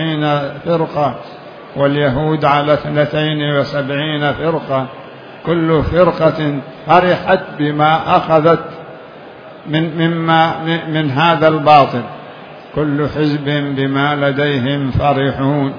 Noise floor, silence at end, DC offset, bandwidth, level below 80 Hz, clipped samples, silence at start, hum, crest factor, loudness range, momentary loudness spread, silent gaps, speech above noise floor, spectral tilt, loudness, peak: -34 dBFS; 0 s; under 0.1%; 5.4 kHz; -40 dBFS; under 0.1%; 0 s; none; 14 dB; 3 LU; 18 LU; none; 21 dB; -8.5 dB/octave; -14 LUFS; 0 dBFS